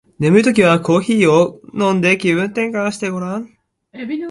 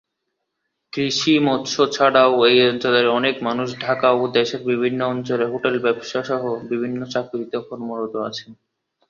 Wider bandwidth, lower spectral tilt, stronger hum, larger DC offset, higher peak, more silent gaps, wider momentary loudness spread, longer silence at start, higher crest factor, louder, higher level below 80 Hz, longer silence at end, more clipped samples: first, 11.5 kHz vs 7.4 kHz; first, -6 dB/octave vs -4.5 dB/octave; neither; neither; about the same, 0 dBFS vs -2 dBFS; neither; about the same, 13 LU vs 13 LU; second, 0.2 s vs 0.95 s; about the same, 16 dB vs 18 dB; first, -15 LUFS vs -19 LUFS; first, -56 dBFS vs -64 dBFS; second, 0 s vs 0.55 s; neither